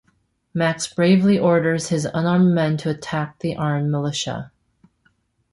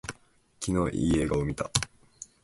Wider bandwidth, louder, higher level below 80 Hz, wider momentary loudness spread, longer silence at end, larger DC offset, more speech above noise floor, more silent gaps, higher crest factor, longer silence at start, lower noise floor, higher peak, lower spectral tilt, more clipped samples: about the same, 11.5 kHz vs 12 kHz; first, -20 LUFS vs -29 LUFS; second, -56 dBFS vs -44 dBFS; second, 10 LU vs 17 LU; first, 1.05 s vs 0.2 s; neither; first, 46 dB vs 32 dB; neither; second, 16 dB vs 26 dB; first, 0.55 s vs 0.05 s; first, -65 dBFS vs -59 dBFS; about the same, -4 dBFS vs -4 dBFS; about the same, -6 dB/octave vs -5 dB/octave; neither